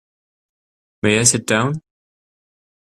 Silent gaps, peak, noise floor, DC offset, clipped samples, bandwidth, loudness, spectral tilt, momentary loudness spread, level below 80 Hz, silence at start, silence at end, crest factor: none; 0 dBFS; under -90 dBFS; under 0.1%; under 0.1%; 15 kHz; -16 LUFS; -3.5 dB/octave; 10 LU; -54 dBFS; 1.05 s; 1.1 s; 22 dB